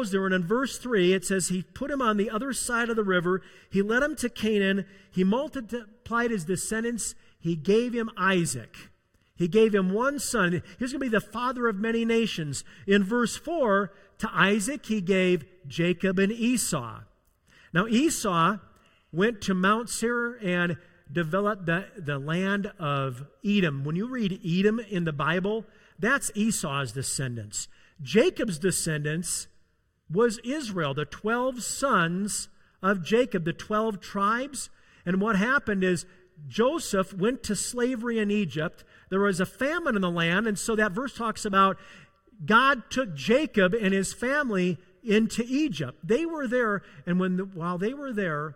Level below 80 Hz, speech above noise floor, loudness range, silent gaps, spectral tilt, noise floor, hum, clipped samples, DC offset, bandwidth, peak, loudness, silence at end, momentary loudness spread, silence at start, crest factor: -56 dBFS; 40 dB; 3 LU; none; -4.5 dB/octave; -66 dBFS; none; under 0.1%; under 0.1%; 16.5 kHz; -6 dBFS; -27 LUFS; 0 s; 9 LU; 0 s; 20 dB